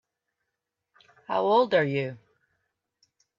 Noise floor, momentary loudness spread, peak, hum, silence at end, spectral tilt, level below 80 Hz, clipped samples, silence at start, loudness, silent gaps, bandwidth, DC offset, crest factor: -84 dBFS; 10 LU; -10 dBFS; none; 1.25 s; -7.5 dB/octave; -74 dBFS; under 0.1%; 1.3 s; -25 LUFS; none; 7.2 kHz; under 0.1%; 18 dB